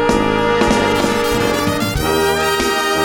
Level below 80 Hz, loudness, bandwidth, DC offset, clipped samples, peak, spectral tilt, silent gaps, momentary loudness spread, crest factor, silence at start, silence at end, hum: -32 dBFS; -15 LUFS; over 20 kHz; under 0.1%; under 0.1%; 0 dBFS; -4 dB/octave; none; 3 LU; 14 dB; 0 s; 0 s; none